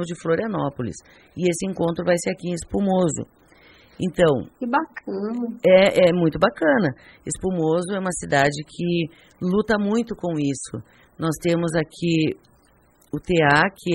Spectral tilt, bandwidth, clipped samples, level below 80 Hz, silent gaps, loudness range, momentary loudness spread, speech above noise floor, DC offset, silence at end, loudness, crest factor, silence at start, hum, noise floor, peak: -5.5 dB/octave; 12.5 kHz; under 0.1%; -50 dBFS; none; 5 LU; 14 LU; 36 dB; under 0.1%; 0 s; -22 LUFS; 20 dB; 0 s; none; -57 dBFS; -2 dBFS